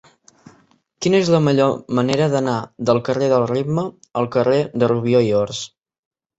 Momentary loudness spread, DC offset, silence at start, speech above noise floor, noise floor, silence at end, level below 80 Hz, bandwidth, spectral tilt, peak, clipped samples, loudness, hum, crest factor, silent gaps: 9 LU; under 0.1%; 1 s; 39 dB; -56 dBFS; 0.7 s; -56 dBFS; 8.2 kHz; -6.5 dB/octave; -2 dBFS; under 0.1%; -18 LUFS; none; 16 dB; none